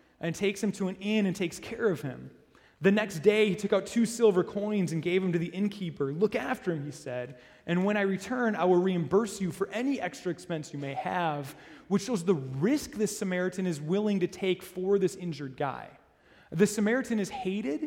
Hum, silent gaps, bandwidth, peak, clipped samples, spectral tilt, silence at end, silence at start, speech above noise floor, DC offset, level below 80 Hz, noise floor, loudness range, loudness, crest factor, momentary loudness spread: none; none; 16.5 kHz; -10 dBFS; under 0.1%; -6 dB/octave; 0 s; 0.2 s; 31 dB; under 0.1%; -66 dBFS; -60 dBFS; 4 LU; -29 LUFS; 20 dB; 11 LU